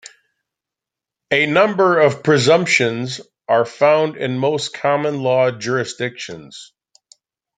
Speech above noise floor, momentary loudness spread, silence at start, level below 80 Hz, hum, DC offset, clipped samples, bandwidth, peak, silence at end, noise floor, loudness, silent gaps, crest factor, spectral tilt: 69 dB; 15 LU; 1.3 s; -64 dBFS; none; under 0.1%; under 0.1%; 9.4 kHz; -2 dBFS; 0.95 s; -86 dBFS; -17 LUFS; none; 18 dB; -4.5 dB/octave